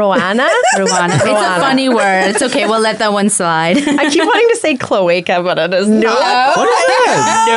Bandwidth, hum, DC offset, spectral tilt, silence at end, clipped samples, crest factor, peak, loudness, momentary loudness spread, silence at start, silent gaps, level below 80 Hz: 12 kHz; none; under 0.1%; -3.5 dB/octave; 0 s; under 0.1%; 8 dB; -2 dBFS; -11 LUFS; 3 LU; 0 s; none; -58 dBFS